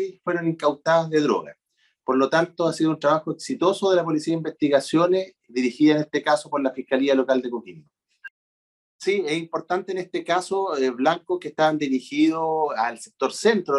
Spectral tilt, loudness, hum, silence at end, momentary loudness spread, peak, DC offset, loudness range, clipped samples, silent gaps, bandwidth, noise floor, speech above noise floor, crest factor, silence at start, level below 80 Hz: -5.5 dB/octave; -23 LUFS; none; 0 s; 7 LU; -6 dBFS; under 0.1%; 4 LU; under 0.1%; 8.30-8.99 s; 12 kHz; under -90 dBFS; over 68 dB; 16 dB; 0 s; -74 dBFS